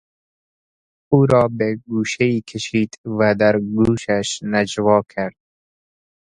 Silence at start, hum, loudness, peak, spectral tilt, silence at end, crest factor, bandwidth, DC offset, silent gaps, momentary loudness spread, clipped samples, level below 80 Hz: 1.1 s; none; -19 LUFS; 0 dBFS; -6 dB/octave; 1 s; 18 dB; 10.5 kHz; under 0.1%; 2.98-3.04 s; 8 LU; under 0.1%; -48 dBFS